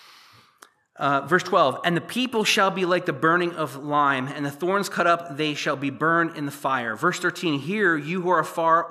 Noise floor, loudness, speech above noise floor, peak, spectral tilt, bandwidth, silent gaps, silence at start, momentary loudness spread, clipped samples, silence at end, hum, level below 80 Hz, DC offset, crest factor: -55 dBFS; -23 LUFS; 32 dB; -6 dBFS; -4.5 dB/octave; 15 kHz; none; 0.95 s; 6 LU; under 0.1%; 0 s; none; -80 dBFS; under 0.1%; 18 dB